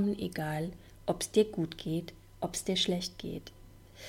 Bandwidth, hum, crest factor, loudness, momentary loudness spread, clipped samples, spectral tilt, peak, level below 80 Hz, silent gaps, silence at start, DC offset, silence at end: 16.5 kHz; none; 20 dB; -34 LUFS; 13 LU; under 0.1%; -4.5 dB/octave; -14 dBFS; -56 dBFS; none; 0 s; under 0.1%; 0 s